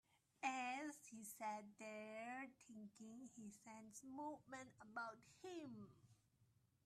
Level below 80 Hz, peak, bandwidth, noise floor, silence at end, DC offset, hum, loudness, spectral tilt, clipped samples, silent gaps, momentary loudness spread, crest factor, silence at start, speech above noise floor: under -90 dBFS; -30 dBFS; 13.5 kHz; -80 dBFS; 0.4 s; under 0.1%; none; -54 LUFS; -3.5 dB/octave; under 0.1%; none; 13 LU; 24 dB; 0.15 s; 24 dB